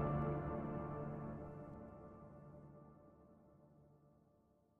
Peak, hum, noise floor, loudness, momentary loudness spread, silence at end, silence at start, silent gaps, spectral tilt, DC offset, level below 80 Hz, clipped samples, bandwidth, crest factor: -30 dBFS; none; -74 dBFS; -47 LUFS; 25 LU; 0.6 s; 0 s; none; -11 dB/octave; under 0.1%; -62 dBFS; under 0.1%; 3.4 kHz; 18 dB